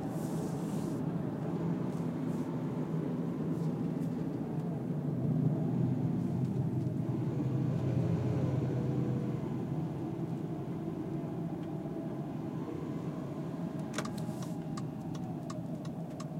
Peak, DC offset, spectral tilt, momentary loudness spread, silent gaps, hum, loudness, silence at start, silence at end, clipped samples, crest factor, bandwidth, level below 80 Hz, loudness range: -18 dBFS; under 0.1%; -8.5 dB/octave; 7 LU; none; none; -36 LUFS; 0 s; 0 s; under 0.1%; 16 dB; 15.5 kHz; -62 dBFS; 6 LU